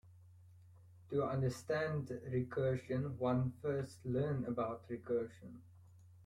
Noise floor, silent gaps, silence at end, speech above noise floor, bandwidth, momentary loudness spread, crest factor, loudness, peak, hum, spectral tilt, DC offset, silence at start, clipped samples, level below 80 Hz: -61 dBFS; none; 0 s; 23 dB; 12 kHz; 7 LU; 16 dB; -39 LUFS; -24 dBFS; none; -8 dB/octave; under 0.1%; 0.05 s; under 0.1%; -66 dBFS